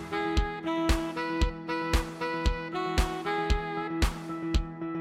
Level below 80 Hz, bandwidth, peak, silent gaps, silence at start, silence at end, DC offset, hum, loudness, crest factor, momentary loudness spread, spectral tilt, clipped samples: -32 dBFS; 16 kHz; -12 dBFS; none; 0 s; 0 s; under 0.1%; none; -31 LUFS; 18 dB; 4 LU; -5.5 dB/octave; under 0.1%